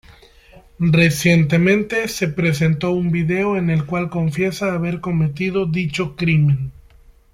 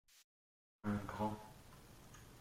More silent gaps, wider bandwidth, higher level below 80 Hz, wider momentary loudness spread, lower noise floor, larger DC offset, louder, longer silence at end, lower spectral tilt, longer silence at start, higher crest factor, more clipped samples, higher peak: second, none vs 0.24-0.79 s; about the same, 15.5 kHz vs 16.5 kHz; first, -44 dBFS vs -66 dBFS; second, 7 LU vs 18 LU; second, -48 dBFS vs under -90 dBFS; neither; first, -18 LUFS vs -44 LUFS; first, 0.65 s vs 0 s; about the same, -6.5 dB/octave vs -6.5 dB/octave; first, 0.8 s vs 0.1 s; about the same, 16 dB vs 20 dB; neither; first, -4 dBFS vs -28 dBFS